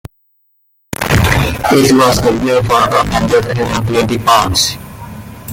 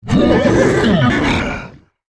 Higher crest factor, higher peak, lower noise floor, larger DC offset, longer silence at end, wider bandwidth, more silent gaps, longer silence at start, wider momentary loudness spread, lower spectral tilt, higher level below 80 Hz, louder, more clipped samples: about the same, 12 dB vs 12 dB; about the same, 0 dBFS vs -2 dBFS; first, -58 dBFS vs -34 dBFS; neither; second, 0 s vs 0.4 s; first, 17 kHz vs 11 kHz; neither; about the same, 0.05 s vs 0.05 s; first, 18 LU vs 9 LU; second, -4.5 dB/octave vs -6.5 dB/octave; about the same, -30 dBFS vs -30 dBFS; about the same, -11 LUFS vs -13 LUFS; neither